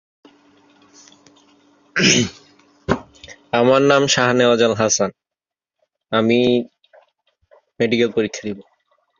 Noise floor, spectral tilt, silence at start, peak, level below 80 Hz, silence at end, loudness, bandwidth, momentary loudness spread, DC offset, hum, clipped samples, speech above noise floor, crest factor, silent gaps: -88 dBFS; -3.5 dB/octave; 1.95 s; -2 dBFS; -52 dBFS; 0.6 s; -17 LUFS; 7.6 kHz; 12 LU; under 0.1%; none; under 0.1%; 72 dB; 18 dB; none